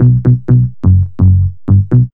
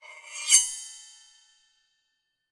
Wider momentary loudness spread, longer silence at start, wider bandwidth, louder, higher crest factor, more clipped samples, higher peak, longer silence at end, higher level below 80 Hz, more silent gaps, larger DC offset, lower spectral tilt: second, 3 LU vs 23 LU; about the same, 0 s vs 0.1 s; second, 1.8 kHz vs 11.5 kHz; first, -11 LUFS vs -21 LUFS; second, 8 dB vs 28 dB; first, 0.6% vs under 0.1%; first, 0 dBFS vs -4 dBFS; second, 0.05 s vs 1.5 s; first, -26 dBFS vs -78 dBFS; neither; neither; first, -13.5 dB/octave vs 7.5 dB/octave